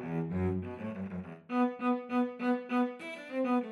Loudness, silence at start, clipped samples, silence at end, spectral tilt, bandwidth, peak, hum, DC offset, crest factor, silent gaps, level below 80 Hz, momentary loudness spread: -34 LUFS; 0 s; under 0.1%; 0 s; -8.5 dB/octave; 10.5 kHz; -22 dBFS; none; under 0.1%; 12 dB; none; -66 dBFS; 9 LU